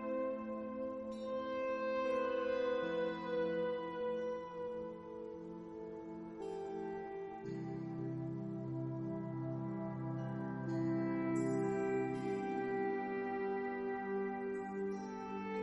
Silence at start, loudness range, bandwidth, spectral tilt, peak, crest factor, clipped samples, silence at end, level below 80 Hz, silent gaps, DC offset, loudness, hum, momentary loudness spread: 0 s; 7 LU; 10.5 kHz; -8 dB/octave; -26 dBFS; 14 dB; under 0.1%; 0 s; -72 dBFS; none; under 0.1%; -41 LUFS; none; 9 LU